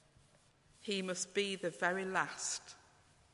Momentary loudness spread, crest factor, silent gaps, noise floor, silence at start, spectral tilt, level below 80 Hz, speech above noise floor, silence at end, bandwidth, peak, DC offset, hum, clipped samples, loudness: 13 LU; 22 dB; none; -68 dBFS; 0.8 s; -2.5 dB/octave; -78 dBFS; 30 dB; 0.55 s; 11.5 kHz; -18 dBFS; under 0.1%; none; under 0.1%; -38 LUFS